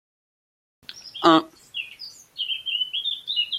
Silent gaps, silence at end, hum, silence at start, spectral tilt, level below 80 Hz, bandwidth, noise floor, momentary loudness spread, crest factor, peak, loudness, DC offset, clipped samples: none; 0 s; none; 0.9 s; -3.5 dB/octave; -72 dBFS; 14.5 kHz; -43 dBFS; 21 LU; 24 dB; -2 dBFS; -23 LUFS; under 0.1%; under 0.1%